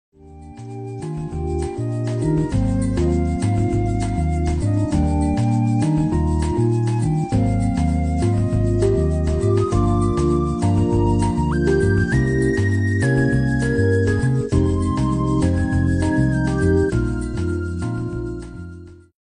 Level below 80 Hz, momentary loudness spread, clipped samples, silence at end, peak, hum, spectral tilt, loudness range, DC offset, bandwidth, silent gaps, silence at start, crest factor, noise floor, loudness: -28 dBFS; 7 LU; under 0.1%; 0.25 s; -6 dBFS; none; -8 dB/octave; 3 LU; under 0.1%; 10 kHz; none; 0.25 s; 14 dB; -39 dBFS; -20 LUFS